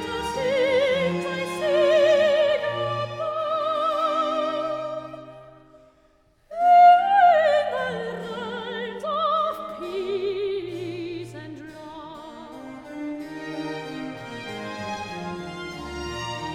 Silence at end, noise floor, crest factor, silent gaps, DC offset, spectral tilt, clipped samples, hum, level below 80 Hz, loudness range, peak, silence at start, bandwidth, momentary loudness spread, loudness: 0 s; -60 dBFS; 18 dB; none; under 0.1%; -5 dB/octave; under 0.1%; none; -56 dBFS; 15 LU; -6 dBFS; 0 s; 13 kHz; 21 LU; -23 LUFS